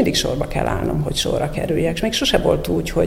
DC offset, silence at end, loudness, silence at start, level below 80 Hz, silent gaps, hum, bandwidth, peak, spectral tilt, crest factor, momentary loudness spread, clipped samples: under 0.1%; 0 s; -20 LUFS; 0 s; -32 dBFS; none; none; 16.5 kHz; -2 dBFS; -4.5 dB/octave; 18 dB; 5 LU; under 0.1%